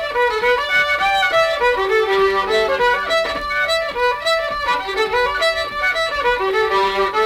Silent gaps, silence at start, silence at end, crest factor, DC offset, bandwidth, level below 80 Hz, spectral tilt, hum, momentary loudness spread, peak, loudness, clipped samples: none; 0 s; 0 s; 12 dB; under 0.1%; 17 kHz; -42 dBFS; -2.5 dB/octave; none; 4 LU; -6 dBFS; -17 LUFS; under 0.1%